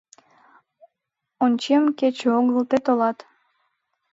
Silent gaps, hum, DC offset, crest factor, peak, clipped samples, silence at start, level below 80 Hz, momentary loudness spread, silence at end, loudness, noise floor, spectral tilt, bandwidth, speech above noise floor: none; none; under 0.1%; 16 dB; -6 dBFS; under 0.1%; 1.4 s; -74 dBFS; 5 LU; 1 s; -21 LUFS; -82 dBFS; -5 dB/octave; 7.8 kHz; 62 dB